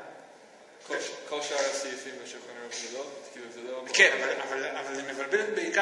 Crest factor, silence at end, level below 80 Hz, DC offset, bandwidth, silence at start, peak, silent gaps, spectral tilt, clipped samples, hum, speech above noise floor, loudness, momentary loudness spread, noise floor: 26 dB; 0 s; -88 dBFS; under 0.1%; 12 kHz; 0 s; -4 dBFS; none; -0.5 dB/octave; under 0.1%; none; 23 dB; -29 LUFS; 21 LU; -53 dBFS